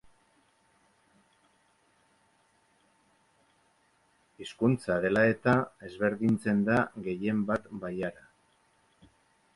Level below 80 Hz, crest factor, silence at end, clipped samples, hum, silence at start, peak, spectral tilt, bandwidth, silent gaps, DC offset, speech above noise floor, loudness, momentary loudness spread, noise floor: -64 dBFS; 20 dB; 1.45 s; under 0.1%; none; 4.4 s; -12 dBFS; -7.5 dB/octave; 11.5 kHz; none; under 0.1%; 40 dB; -29 LUFS; 13 LU; -69 dBFS